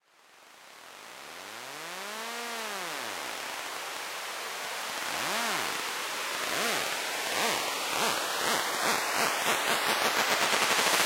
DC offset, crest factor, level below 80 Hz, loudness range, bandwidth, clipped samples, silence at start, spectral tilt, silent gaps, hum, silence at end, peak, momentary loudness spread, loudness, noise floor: under 0.1%; 24 dB; -74 dBFS; 10 LU; 16 kHz; under 0.1%; 0.4 s; -0.5 dB/octave; none; none; 0 s; -6 dBFS; 14 LU; -29 LUFS; -58 dBFS